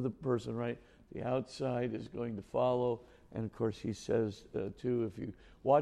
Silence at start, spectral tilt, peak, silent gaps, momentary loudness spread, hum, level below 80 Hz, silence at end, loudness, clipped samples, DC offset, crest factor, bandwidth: 0 s; -7.5 dB/octave; -16 dBFS; none; 10 LU; none; -62 dBFS; 0 s; -37 LUFS; under 0.1%; under 0.1%; 20 dB; 11.5 kHz